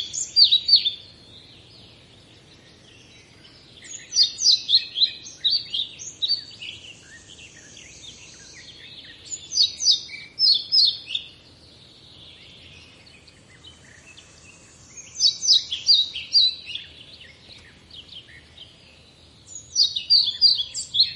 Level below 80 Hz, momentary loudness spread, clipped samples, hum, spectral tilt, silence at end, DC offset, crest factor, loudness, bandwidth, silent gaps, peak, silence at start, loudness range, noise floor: -64 dBFS; 25 LU; under 0.1%; none; 1.5 dB/octave; 0 s; under 0.1%; 22 dB; -18 LUFS; 11.5 kHz; none; -2 dBFS; 0 s; 11 LU; -51 dBFS